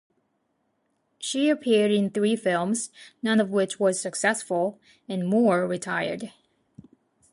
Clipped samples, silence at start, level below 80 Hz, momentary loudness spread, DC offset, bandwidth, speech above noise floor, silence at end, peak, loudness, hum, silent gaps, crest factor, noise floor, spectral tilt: under 0.1%; 1.2 s; -72 dBFS; 10 LU; under 0.1%; 11.5 kHz; 49 dB; 1.05 s; -8 dBFS; -25 LUFS; none; none; 18 dB; -73 dBFS; -4.5 dB/octave